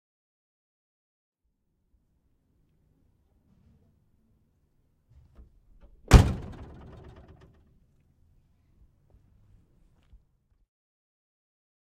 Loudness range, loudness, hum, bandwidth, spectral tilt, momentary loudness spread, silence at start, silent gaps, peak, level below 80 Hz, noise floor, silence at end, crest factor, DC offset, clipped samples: 0 LU; -22 LUFS; none; 15.5 kHz; -6 dB/octave; 30 LU; 6.1 s; none; -2 dBFS; -36 dBFS; -76 dBFS; 5.5 s; 32 dB; under 0.1%; under 0.1%